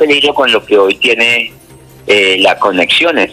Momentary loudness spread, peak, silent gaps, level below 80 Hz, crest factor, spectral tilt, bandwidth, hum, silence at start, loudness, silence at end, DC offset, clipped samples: 4 LU; 0 dBFS; none; -50 dBFS; 10 dB; -2.5 dB/octave; 15 kHz; none; 0 s; -9 LUFS; 0 s; under 0.1%; under 0.1%